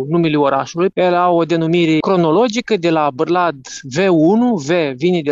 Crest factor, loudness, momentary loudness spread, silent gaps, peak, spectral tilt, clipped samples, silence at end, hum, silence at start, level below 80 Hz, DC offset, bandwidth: 12 dB; -15 LUFS; 4 LU; none; -2 dBFS; -6 dB/octave; under 0.1%; 0 s; none; 0 s; -58 dBFS; under 0.1%; 7.8 kHz